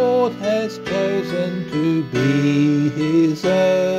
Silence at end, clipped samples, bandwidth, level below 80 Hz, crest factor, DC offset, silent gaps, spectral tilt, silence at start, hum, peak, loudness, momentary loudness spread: 0 s; under 0.1%; 13.5 kHz; -56 dBFS; 12 dB; under 0.1%; none; -7 dB/octave; 0 s; none; -6 dBFS; -19 LUFS; 6 LU